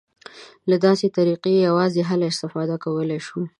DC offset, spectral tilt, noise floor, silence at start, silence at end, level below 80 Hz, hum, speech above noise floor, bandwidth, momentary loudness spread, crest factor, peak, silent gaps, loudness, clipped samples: under 0.1%; -6.5 dB/octave; -44 dBFS; 0.35 s; 0.1 s; -68 dBFS; none; 24 dB; 11 kHz; 8 LU; 18 dB; -4 dBFS; none; -21 LUFS; under 0.1%